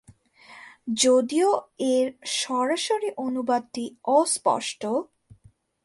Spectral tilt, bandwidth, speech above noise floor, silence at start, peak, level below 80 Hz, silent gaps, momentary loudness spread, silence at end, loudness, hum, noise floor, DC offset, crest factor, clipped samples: -2.5 dB/octave; 11.5 kHz; 34 dB; 0.5 s; -6 dBFS; -68 dBFS; none; 11 LU; 0.8 s; -24 LUFS; none; -58 dBFS; under 0.1%; 18 dB; under 0.1%